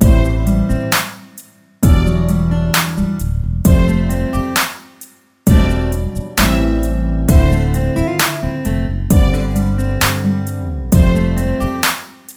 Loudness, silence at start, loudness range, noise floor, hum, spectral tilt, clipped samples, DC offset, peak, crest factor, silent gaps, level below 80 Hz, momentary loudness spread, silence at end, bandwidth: -15 LUFS; 0 s; 1 LU; -42 dBFS; none; -5.5 dB/octave; under 0.1%; under 0.1%; 0 dBFS; 14 dB; none; -18 dBFS; 7 LU; 0.05 s; over 20 kHz